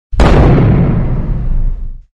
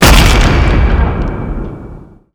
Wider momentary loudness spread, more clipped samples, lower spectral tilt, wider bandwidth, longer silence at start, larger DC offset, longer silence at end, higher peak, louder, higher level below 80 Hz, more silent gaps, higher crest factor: second, 13 LU vs 19 LU; second, under 0.1% vs 1%; first, -8.5 dB/octave vs -4.5 dB/octave; second, 8.4 kHz vs over 20 kHz; about the same, 0.1 s vs 0 s; neither; second, 0.15 s vs 0.3 s; about the same, 0 dBFS vs 0 dBFS; about the same, -11 LUFS vs -11 LUFS; about the same, -12 dBFS vs -12 dBFS; neither; about the same, 10 dB vs 10 dB